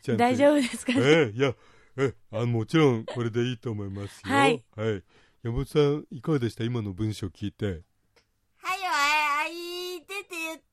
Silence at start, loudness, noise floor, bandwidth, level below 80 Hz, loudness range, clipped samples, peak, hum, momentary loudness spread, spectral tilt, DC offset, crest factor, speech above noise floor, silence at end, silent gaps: 0.05 s; -26 LUFS; -67 dBFS; 14.5 kHz; -52 dBFS; 5 LU; under 0.1%; -8 dBFS; none; 14 LU; -5.5 dB/octave; under 0.1%; 18 dB; 41 dB; 0.15 s; none